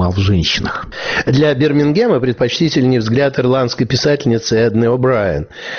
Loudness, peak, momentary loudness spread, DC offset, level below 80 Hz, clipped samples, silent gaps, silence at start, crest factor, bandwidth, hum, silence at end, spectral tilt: -14 LUFS; -2 dBFS; 5 LU; under 0.1%; -36 dBFS; under 0.1%; none; 0 s; 10 dB; 6.8 kHz; none; 0 s; -5 dB/octave